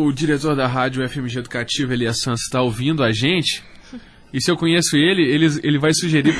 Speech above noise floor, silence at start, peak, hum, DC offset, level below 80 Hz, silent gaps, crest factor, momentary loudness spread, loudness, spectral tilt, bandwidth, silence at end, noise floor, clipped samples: 21 dB; 0 s; -4 dBFS; none; under 0.1%; -46 dBFS; none; 14 dB; 9 LU; -18 LUFS; -4.5 dB/octave; 11 kHz; 0 s; -39 dBFS; under 0.1%